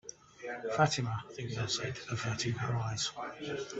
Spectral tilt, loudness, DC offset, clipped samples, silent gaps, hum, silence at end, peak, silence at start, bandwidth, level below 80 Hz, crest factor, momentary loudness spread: -4 dB/octave; -35 LUFS; under 0.1%; under 0.1%; none; none; 0 s; -12 dBFS; 0.05 s; 8.4 kHz; -64 dBFS; 24 dB; 11 LU